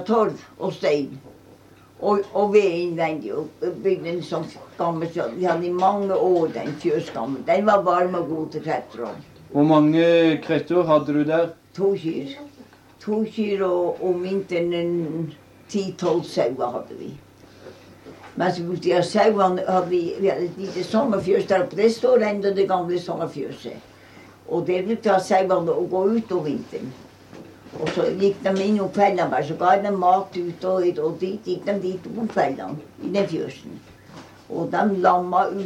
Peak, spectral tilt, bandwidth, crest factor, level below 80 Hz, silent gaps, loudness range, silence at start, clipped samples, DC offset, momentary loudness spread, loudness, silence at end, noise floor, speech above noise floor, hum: -4 dBFS; -6.5 dB/octave; 12 kHz; 18 dB; -64 dBFS; none; 6 LU; 0 s; under 0.1%; under 0.1%; 13 LU; -22 LUFS; 0 s; -49 dBFS; 28 dB; none